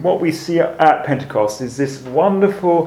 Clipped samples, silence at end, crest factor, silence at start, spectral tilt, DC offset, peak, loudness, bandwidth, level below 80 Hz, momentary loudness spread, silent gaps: under 0.1%; 0 s; 16 dB; 0 s; -6.5 dB/octave; under 0.1%; 0 dBFS; -17 LUFS; 16 kHz; -56 dBFS; 8 LU; none